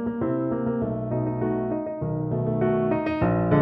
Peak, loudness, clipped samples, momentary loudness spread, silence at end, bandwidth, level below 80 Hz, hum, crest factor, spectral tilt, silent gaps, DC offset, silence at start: -6 dBFS; -25 LUFS; under 0.1%; 5 LU; 0 s; 5.2 kHz; -46 dBFS; none; 18 dB; -12 dB/octave; none; under 0.1%; 0 s